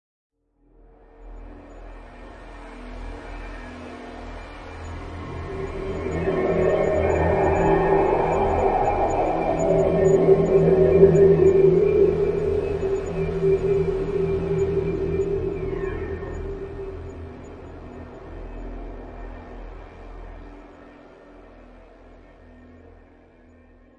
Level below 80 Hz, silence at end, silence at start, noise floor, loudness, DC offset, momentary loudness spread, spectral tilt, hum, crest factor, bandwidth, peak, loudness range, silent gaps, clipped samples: -38 dBFS; 2.25 s; 1.2 s; -58 dBFS; -21 LUFS; under 0.1%; 25 LU; -8.5 dB/octave; none; 20 dB; 7.4 kHz; -2 dBFS; 23 LU; none; under 0.1%